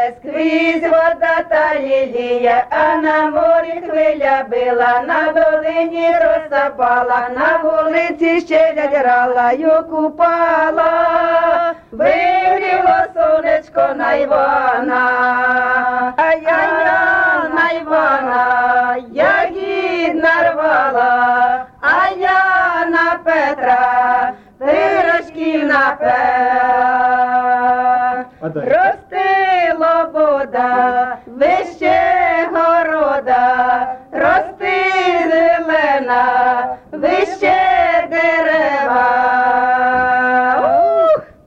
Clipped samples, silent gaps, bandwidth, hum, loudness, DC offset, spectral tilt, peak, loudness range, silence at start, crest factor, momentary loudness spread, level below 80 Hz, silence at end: under 0.1%; none; 7.6 kHz; none; -14 LUFS; under 0.1%; -5.5 dB/octave; -4 dBFS; 1 LU; 0 s; 10 dB; 4 LU; -50 dBFS; 0.25 s